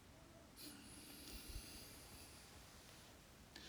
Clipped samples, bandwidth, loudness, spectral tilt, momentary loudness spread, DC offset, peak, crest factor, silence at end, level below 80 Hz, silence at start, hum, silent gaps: under 0.1%; over 20 kHz; -57 LUFS; -3 dB/octave; 9 LU; under 0.1%; -38 dBFS; 20 dB; 0 s; -64 dBFS; 0 s; none; none